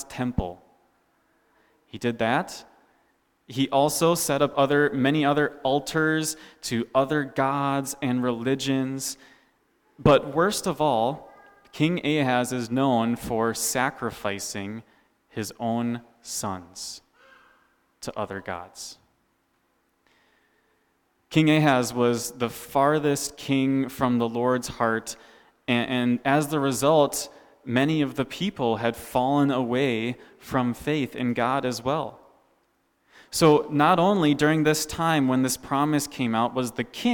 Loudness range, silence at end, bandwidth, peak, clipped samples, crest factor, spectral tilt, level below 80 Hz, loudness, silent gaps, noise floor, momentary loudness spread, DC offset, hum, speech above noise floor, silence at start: 10 LU; 0 s; 19 kHz; -8 dBFS; under 0.1%; 18 dB; -5 dB/octave; -54 dBFS; -24 LUFS; none; -69 dBFS; 14 LU; under 0.1%; none; 46 dB; 0 s